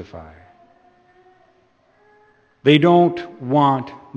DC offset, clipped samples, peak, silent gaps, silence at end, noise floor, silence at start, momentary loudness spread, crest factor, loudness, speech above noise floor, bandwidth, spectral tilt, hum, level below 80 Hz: under 0.1%; under 0.1%; 0 dBFS; none; 0.2 s; -58 dBFS; 0 s; 20 LU; 20 dB; -17 LUFS; 41 dB; 7.2 kHz; -8 dB/octave; none; -58 dBFS